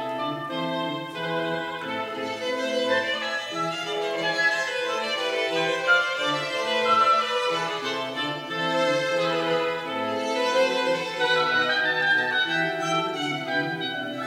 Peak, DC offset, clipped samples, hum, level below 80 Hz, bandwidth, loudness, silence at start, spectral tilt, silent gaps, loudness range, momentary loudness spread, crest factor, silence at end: -10 dBFS; under 0.1%; under 0.1%; none; -72 dBFS; 16 kHz; -24 LUFS; 0 s; -3.5 dB/octave; none; 4 LU; 8 LU; 16 dB; 0 s